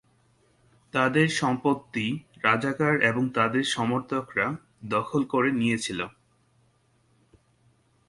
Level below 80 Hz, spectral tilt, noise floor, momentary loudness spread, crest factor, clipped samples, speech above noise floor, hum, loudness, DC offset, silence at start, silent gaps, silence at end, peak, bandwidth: -64 dBFS; -5 dB/octave; -66 dBFS; 8 LU; 22 dB; under 0.1%; 40 dB; none; -26 LUFS; under 0.1%; 0.95 s; none; 2 s; -6 dBFS; 11.5 kHz